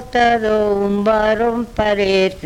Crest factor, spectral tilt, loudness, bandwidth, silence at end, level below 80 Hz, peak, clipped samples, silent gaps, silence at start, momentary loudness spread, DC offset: 14 dB; -5.5 dB/octave; -16 LUFS; 15 kHz; 0 s; -38 dBFS; -2 dBFS; under 0.1%; none; 0 s; 4 LU; under 0.1%